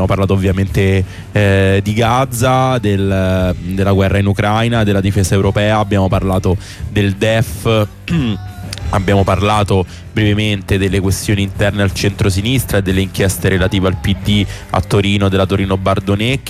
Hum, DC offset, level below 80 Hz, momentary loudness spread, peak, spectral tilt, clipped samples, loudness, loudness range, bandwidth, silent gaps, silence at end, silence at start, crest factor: none; under 0.1%; -30 dBFS; 5 LU; -4 dBFS; -6 dB/octave; under 0.1%; -14 LUFS; 2 LU; 15.5 kHz; none; 0 s; 0 s; 10 dB